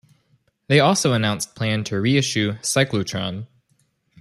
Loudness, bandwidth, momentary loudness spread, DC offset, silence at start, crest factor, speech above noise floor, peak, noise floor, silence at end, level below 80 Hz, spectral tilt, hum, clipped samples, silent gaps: -20 LUFS; 14.5 kHz; 11 LU; under 0.1%; 0.7 s; 18 dB; 45 dB; -4 dBFS; -66 dBFS; 0.75 s; -58 dBFS; -4.5 dB/octave; none; under 0.1%; none